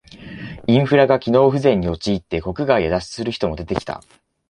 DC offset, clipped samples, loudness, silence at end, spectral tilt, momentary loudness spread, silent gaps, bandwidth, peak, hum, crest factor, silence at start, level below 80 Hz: under 0.1%; under 0.1%; -18 LUFS; 0.5 s; -7 dB/octave; 17 LU; none; 10.5 kHz; -2 dBFS; none; 18 dB; 0.15 s; -40 dBFS